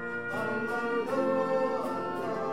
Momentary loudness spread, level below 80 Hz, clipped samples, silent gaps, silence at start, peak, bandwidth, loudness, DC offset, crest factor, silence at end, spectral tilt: 5 LU; -78 dBFS; under 0.1%; none; 0 s; -18 dBFS; 16 kHz; -31 LUFS; 0.4%; 12 dB; 0 s; -6 dB/octave